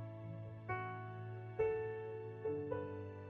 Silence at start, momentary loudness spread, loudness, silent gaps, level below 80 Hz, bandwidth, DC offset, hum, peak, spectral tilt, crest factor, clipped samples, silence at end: 0 s; 10 LU; -44 LUFS; none; -70 dBFS; 4.6 kHz; under 0.1%; none; -26 dBFS; -7 dB/octave; 18 dB; under 0.1%; 0 s